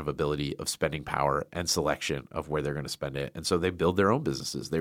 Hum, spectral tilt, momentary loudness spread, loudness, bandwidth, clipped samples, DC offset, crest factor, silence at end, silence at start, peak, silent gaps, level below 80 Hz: none; -4.5 dB/octave; 8 LU; -29 LUFS; 16.5 kHz; under 0.1%; under 0.1%; 20 dB; 0 s; 0 s; -8 dBFS; none; -52 dBFS